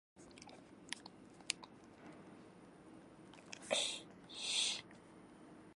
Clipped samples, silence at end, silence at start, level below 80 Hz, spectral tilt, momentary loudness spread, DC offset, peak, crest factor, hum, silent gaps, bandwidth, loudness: under 0.1%; 0 s; 0.15 s; -80 dBFS; -0.5 dB/octave; 23 LU; under 0.1%; -14 dBFS; 34 dB; none; none; 11.5 kHz; -41 LUFS